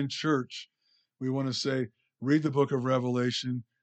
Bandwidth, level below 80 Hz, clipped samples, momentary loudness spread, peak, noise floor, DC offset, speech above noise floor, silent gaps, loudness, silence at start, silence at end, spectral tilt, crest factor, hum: 8.8 kHz; -76 dBFS; under 0.1%; 11 LU; -14 dBFS; -71 dBFS; under 0.1%; 42 dB; none; -30 LUFS; 0 s; 0.2 s; -6 dB/octave; 16 dB; none